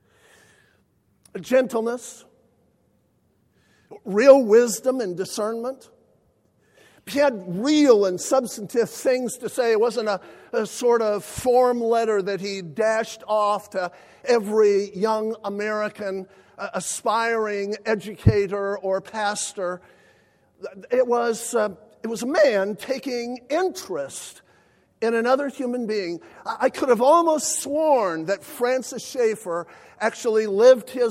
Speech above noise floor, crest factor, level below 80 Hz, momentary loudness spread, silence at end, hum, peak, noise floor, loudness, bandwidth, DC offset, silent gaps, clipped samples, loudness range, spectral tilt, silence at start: 43 dB; 22 dB; -52 dBFS; 14 LU; 0 s; none; 0 dBFS; -65 dBFS; -22 LUFS; 16 kHz; under 0.1%; none; under 0.1%; 5 LU; -4.5 dB/octave; 1.35 s